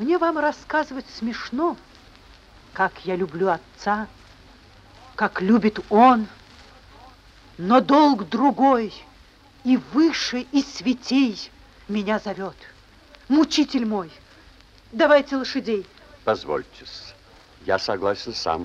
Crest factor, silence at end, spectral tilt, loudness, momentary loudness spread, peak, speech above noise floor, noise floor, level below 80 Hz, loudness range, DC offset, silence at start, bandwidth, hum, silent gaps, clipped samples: 20 dB; 0 s; -5 dB/octave; -22 LUFS; 19 LU; -4 dBFS; 30 dB; -51 dBFS; -54 dBFS; 7 LU; under 0.1%; 0 s; 8 kHz; none; none; under 0.1%